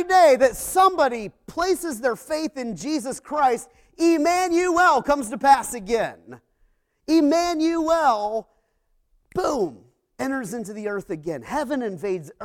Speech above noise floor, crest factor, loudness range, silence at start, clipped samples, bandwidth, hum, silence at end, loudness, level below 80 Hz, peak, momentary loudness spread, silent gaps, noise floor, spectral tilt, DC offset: 46 dB; 18 dB; 8 LU; 0 s; under 0.1%; 17 kHz; none; 0 s; -22 LUFS; -54 dBFS; -4 dBFS; 13 LU; none; -67 dBFS; -4 dB/octave; under 0.1%